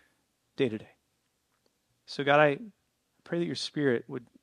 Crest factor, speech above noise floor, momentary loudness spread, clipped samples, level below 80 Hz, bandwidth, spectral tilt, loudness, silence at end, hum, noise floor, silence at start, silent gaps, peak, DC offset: 24 dB; 47 dB; 19 LU; under 0.1%; -80 dBFS; 10.5 kHz; -5.5 dB/octave; -29 LUFS; 0.2 s; none; -76 dBFS; 0.6 s; none; -8 dBFS; under 0.1%